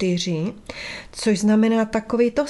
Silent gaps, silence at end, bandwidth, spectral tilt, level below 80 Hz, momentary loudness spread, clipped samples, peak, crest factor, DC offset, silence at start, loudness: none; 0 s; 12 kHz; -5.5 dB/octave; -50 dBFS; 14 LU; under 0.1%; -6 dBFS; 14 dB; under 0.1%; 0 s; -21 LUFS